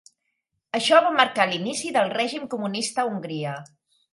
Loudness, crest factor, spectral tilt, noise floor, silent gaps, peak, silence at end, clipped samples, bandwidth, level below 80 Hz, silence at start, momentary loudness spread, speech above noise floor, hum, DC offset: -23 LUFS; 22 dB; -3.5 dB/octave; -77 dBFS; none; -2 dBFS; 0.5 s; under 0.1%; 11.5 kHz; -76 dBFS; 0.75 s; 13 LU; 54 dB; none; under 0.1%